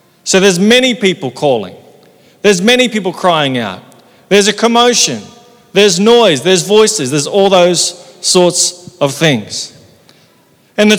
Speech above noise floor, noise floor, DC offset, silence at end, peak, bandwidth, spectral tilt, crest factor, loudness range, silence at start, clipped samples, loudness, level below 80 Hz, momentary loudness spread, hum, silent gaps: 39 dB; -49 dBFS; under 0.1%; 0 s; 0 dBFS; over 20 kHz; -3 dB/octave; 12 dB; 4 LU; 0.25 s; 0.7%; -10 LUFS; -56 dBFS; 10 LU; none; none